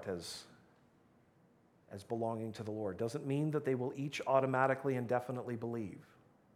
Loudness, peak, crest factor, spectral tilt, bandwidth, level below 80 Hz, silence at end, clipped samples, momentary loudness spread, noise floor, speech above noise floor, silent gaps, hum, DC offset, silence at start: -37 LUFS; -16 dBFS; 22 dB; -6.5 dB/octave; 15.5 kHz; -78 dBFS; 0.5 s; under 0.1%; 14 LU; -69 dBFS; 32 dB; none; none; under 0.1%; 0 s